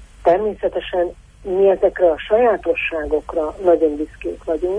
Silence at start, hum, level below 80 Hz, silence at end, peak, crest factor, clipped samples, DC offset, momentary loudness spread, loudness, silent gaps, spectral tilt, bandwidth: 0 s; none; -42 dBFS; 0 s; -4 dBFS; 16 dB; under 0.1%; under 0.1%; 9 LU; -18 LUFS; none; -6.5 dB/octave; 10 kHz